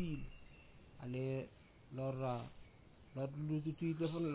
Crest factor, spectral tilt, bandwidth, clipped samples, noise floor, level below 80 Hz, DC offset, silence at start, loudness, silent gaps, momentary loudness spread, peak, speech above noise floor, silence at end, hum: 14 dB; -8 dB/octave; 4 kHz; under 0.1%; -62 dBFS; -62 dBFS; under 0.1%; 0 s; -43 LUFS; none; 22 LU; -28 dBFS; 21 dB; 0 s; none